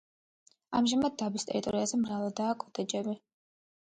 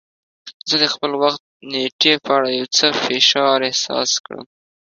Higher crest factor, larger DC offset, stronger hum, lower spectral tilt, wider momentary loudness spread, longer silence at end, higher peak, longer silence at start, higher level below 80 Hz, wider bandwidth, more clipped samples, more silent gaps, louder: about the same, 16 dB vs 20 dB; neither; neither; first, -4.5 dB/octave vs -1.5 dB/octave; second, 7 LU vs 12 LU; first, 0.7 s vs 0.5 s; second, -16 dBFS vs 0 dBFS; first, 0.7 s vs 0.45 s; about the same, -68 dBFS vs -66 dBFS; first, 9.4 kHz vs 7.6 kHz; neither; second, none vs 0.54-0.60 s, 1.40-1.60 s, 1.92-1.99 s, 4.20-4.24 s; second, -32 LUFS vs -16 LUFS